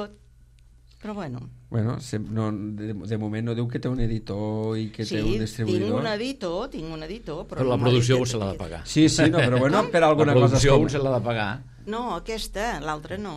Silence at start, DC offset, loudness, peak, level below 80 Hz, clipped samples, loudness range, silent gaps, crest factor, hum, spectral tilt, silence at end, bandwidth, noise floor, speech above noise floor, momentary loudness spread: 0 s; under 0.1%; -24 LUFS; -4 dBFS; -40 dBFS; under 0.1%; 9 LU; none; 20 dB; none; -6 dB/octave; 0 s; 13 kHz; -53 dBFS; 29 dB; 16 LU